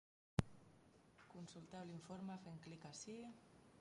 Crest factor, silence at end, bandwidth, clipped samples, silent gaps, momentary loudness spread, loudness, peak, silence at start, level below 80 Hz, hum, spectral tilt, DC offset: 32 dB; 0 s; 11 kHz; under 0.1%; none; 22 LU; -52 LUFS; -20 dBFS; 0.4 s; -68 dBFS; none; -5.5 dB/octave; under 0.1%